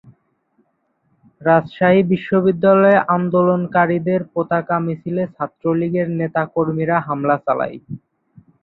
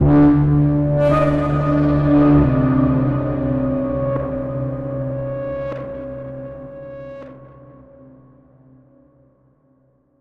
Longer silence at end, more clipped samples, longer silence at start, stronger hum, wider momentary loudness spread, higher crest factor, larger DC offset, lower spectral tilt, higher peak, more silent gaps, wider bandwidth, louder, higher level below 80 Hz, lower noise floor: second, 0.65 s vs 2.75 s; neither; first, 1.4 s vs 0 s; neither; second, 10 LU vs 20 LU; about the same, 16 dB vs 14 dB; neither; about the same, -11 dB/octave vs -10.5 dB/octave; about the same, -2 dBFS vs -4 dBFS; neither; second, 4.2 kHz vs 4.8 kHz; about the same, -17 LUFS vs -18 LUFS; second, -60 dBFS vs -34 dBFS; first, -66 dBFS vs -58 dBFS